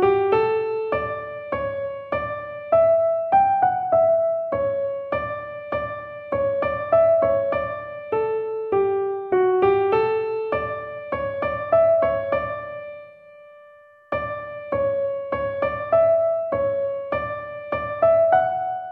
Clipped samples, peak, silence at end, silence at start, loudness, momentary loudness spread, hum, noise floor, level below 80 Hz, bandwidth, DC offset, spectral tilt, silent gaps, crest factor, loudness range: under 0.1%; -6 dBFS; 0 s; 0 s; -22 LUFS; 12 LU; none; -49 dBFS; -52 dBFS; 4.5 kHz; under 0.1%; -9 dB/octave; none; 16 dB; 4 LU